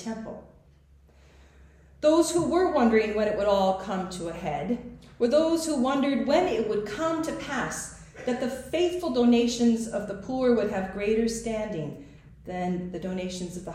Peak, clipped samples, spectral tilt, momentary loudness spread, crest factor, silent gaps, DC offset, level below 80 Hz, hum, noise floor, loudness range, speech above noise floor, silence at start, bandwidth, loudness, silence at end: -10 dBFS; under 0.1%; -5 dB/octave; 13 LU; 16 dB; none; under 0.1%; -52 dBFS; none; -56 dBFS; 3 LU; 31 dB; 0 s; 14.5 kHz; -26 LUFS; 0 s